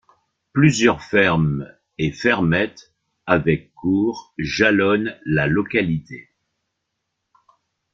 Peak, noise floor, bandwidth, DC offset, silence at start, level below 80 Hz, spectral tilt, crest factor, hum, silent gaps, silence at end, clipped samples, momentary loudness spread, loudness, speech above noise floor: -2 dBFS; -77 dBFS; 7.6 kHz; under 0.1%; 0.55 s; -48 dBFS; -6 dB/octave; 18 dB; none; none; 1.75 s; under 0.1%; 12 LU; -19 LUFS; 58 dB